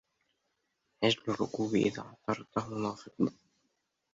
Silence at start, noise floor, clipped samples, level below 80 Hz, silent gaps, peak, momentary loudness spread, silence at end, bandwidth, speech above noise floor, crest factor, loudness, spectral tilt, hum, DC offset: 1 s; -81 dBFS; under 0.1%; -68 dBFS; none; -14 dBFS; 7 LU; 0.8 s; 7.8 kHz; 48 dB; 22 dB; -33 LUFS; -5.5 dB/octave; none; under 0.1%